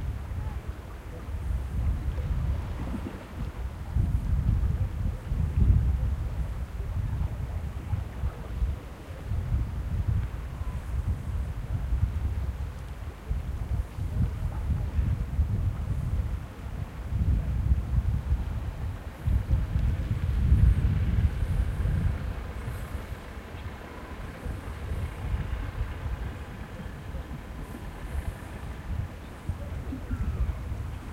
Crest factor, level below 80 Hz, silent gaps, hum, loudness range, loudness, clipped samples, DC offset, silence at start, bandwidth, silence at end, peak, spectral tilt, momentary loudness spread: 20 dB; -32 dBFS; none; none; 9 LU; -32 LUFS; under 0.1%; under 0.1%; 0 s; 13.5 kHz; 0 s; -8 dBFS; -8 dB/octave; 12 LU